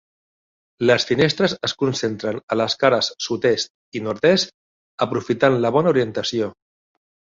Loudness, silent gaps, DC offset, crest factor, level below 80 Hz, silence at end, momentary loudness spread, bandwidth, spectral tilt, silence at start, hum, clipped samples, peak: -20 LUFS; 2.43-2.48 s, 3.70-3.92 s, 4.54-4.98 s; under 0.1%; 18 dB; -58 dBFS; 0.85 s; 9 LU; 7.8 kHz; -4.5 dB/octave; 0.8 s; none; under 0.1%; -2 dBFS